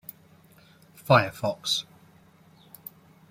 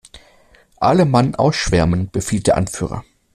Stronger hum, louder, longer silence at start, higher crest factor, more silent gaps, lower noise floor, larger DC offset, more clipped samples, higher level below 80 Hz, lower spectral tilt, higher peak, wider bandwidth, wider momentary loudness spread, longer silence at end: neither; second, -24 LUFS vs -17 LUFS; first, 1.05 s vs 0.15 s; first, 26 dB vs 16 dB; neither; first, -56 dBFS vs -51 dBFS; neither; neither; second, -66 dBFS vs -36 dBFS; second, -4.5 dB/octave vs -6 dB/octave; about the same, -4 dBFS vs -2 dBFS; first, 16.5 kHz vs 14.5 kHz; first, 24 LU vs 10 LU; first, 1.5 s vs 0.35 s